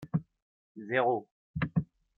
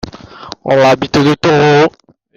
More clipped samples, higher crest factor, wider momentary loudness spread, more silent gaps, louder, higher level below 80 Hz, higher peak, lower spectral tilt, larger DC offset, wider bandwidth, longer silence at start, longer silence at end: neither; first, 20 dB vs 12 dB; second, 12 LU vs 18 LU; first, 0.42-0.75 s, 1.31-1.54 s vs none; second, -32 LUFS vs -10 LUFS; second, -58 dBFS vs -44 dBFS; second, -14 dBFS vs 0 dBFS; first, -9.5 dB/octave vs -6 dB/octave; neither; second, 4.3 kHz vs 9.6 kHz; about the same, 0 s vs 0.05 s; about the same, 0.35 s vs 0.45 s